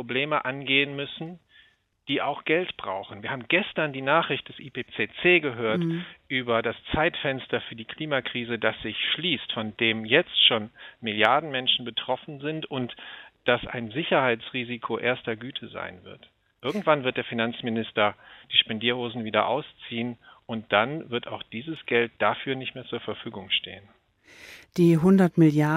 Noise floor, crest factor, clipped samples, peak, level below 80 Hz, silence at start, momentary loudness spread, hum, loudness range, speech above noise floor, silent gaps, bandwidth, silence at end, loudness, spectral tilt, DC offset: -60 dBFS; 26 dB; under 0.1%; -2 dBFS; -60 dBFS; 0 s; 15 LU; none; 5 LU; 34 dB; none; 13.5 kHz; 0 s; -25 LUFS; -6.5 dB/octave; under 0.1%